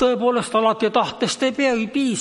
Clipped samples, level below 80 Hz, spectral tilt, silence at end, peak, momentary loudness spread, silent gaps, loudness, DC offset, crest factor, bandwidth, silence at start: under 0.1%; -60 dBFS; -4 dB/octave; 0 s; -4 dBFS; 3 LU; none; -20 LUFS; under 0.1%; 16 dB; 11.5 kHz; 0 s